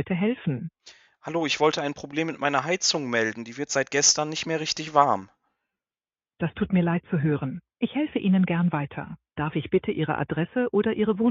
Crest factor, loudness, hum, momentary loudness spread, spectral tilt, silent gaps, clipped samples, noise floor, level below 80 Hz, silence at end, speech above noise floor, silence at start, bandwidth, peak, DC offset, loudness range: 22 dB; -25 LUFS; none; 11 LU; -4 dB/octave; none; under 0.1%; under -90 dBFS; -58 dBFS; 0 s; over 65 dB; 0 s; 7.8 kHz; -4 dBFS; under 0.1%; 3 LU